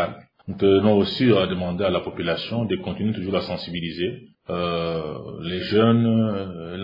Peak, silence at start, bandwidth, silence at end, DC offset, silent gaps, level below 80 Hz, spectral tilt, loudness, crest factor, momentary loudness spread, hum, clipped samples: -4 dBFS; 0 s; 5.4 kHz; 0 s; under 0.1%; none; -56 dBFS; -9 dB/octave; -23 LUFS; 18 dB; 13 LU; none; under 0.1%